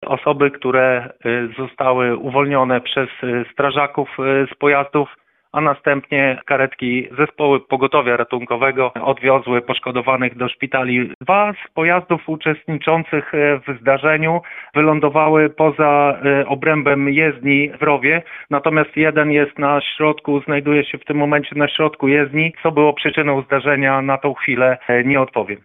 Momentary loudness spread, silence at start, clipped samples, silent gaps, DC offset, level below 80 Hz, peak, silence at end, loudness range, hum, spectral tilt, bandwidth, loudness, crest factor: 6 LU; 0 s; under 0.1%; 11.15-11.21 s; under 0.1%; -58 dBFS; 0 dBFS; 0.05 s; 3 LU; none; -8.5 dB/octave; 3.9 kHz; -16 LUFS; 16 dB